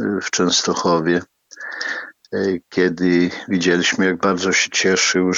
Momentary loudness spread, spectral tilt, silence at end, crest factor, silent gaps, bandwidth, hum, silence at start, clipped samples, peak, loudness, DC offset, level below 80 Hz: 10 LU; -3.5 dB/octave; 0 s; 16 dB; none; 7.8 kHz; none; 0 s; under 0.1%; -2 dBFS; -18 LUFS; under 0.1%; -64 dBFS